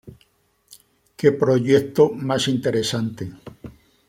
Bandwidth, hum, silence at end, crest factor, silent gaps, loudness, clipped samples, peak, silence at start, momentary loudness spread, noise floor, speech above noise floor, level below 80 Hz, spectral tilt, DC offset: 16.5 kHz; none; 0.4 s; 20 dB; none; -20 LUFS; under 0.1%; -2 dBFS; 0.05 s; 18 LU; -62 dBFS; 43 dB; -58 dBFS; -5.5 dB/octave; under 0.1%